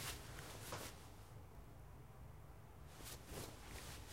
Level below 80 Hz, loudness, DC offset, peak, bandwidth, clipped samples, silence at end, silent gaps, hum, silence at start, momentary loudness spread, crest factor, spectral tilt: -62 dBFS; -54 LUFS; under 0.1%; -34 dBFS; 16 kHz; under 0.1%; 0 s; none; none; 0 s; 10 LU; 20 dB; -3.5 dB/octave